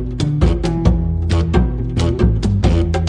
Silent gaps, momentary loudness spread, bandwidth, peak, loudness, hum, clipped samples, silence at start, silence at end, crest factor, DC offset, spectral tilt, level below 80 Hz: none; 3 LU; 10 kHz; -2 dBFS; -17 LUFS; none; under 0.1%; 0 s; 0 s; 14 dB; under 0.1%; -7.5 dB/octave; -20 dBFS